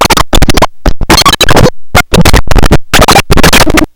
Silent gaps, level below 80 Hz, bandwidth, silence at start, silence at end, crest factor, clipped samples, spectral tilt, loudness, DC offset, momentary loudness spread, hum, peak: none; -10 dBFS; over 20 kHz; 0 s; 0.1 s; 4 dB; 20%; -3.5 dB/octave; -5 LUFS; under 0.1%; 5 LU; none; 0 dBFS